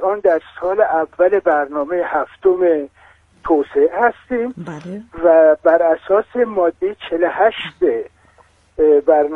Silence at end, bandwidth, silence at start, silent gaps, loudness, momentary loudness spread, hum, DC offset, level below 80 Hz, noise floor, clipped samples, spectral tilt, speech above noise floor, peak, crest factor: 0 s; 6.2 kHz; 0 s; none; -16 LUFS; 13 LU; none; under 0.1%; -52 dBFS; -52 dBFS; under 0.1%; -7 dB/octave; 36 dB; 0 dBFS; 16 dB